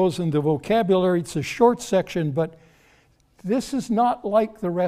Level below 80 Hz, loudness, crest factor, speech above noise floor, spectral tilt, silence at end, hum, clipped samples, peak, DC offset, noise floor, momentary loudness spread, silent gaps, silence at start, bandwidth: -54 dBFS; -22 LUFS; 18 dB; 38 dB; -6.5 dB/octave; 0 s; none; under 0.1%; -4 dBFS; under 0.1%; -59 dBFS; 7 LU; none; 0 s; 15.5 kHz